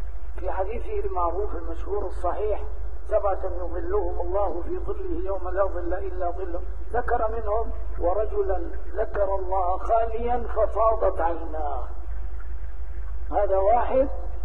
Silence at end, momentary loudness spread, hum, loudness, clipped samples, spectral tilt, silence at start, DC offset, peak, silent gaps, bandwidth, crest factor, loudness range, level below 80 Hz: 0 s; 14 LU; none; -27 LUFS; under 0.1%; -9 dB/octave; 0 s; 6%; -8 dBFS; none; 3.9 kHz; 18 dB; 3 LU; -32 dBFS